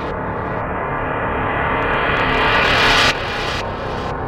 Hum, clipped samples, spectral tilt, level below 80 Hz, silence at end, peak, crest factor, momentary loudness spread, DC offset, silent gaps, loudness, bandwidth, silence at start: none; under 0.1%; -4 dB/octave; -32 dBFS; 0 s; -4 dBFS; 16 dB; 11 LU; under 0.1%; none; -17 LUFS; 16 kHz; 0 s